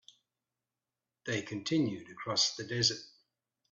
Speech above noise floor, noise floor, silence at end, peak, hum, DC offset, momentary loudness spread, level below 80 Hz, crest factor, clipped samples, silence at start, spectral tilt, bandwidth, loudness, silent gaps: over 56 dB; under -90 dBFS; 0.6 s; -14 dBFS; none; under 0.1%; 12 LU; -74 dBFS; 22 dB; under 0.1%; 1.25 s; -3 dB/octave; 8.4 kHz; -32 LUFS; none